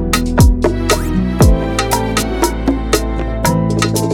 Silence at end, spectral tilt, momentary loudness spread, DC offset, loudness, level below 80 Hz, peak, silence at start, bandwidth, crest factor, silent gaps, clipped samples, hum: 0 s; -5 dB/octave; 5 LU; under 0.1%; -14 LUFS; -18 dBFS; 0 dBFS; 0 s; 19 kHz; 14 dB; none; under 0.1%; none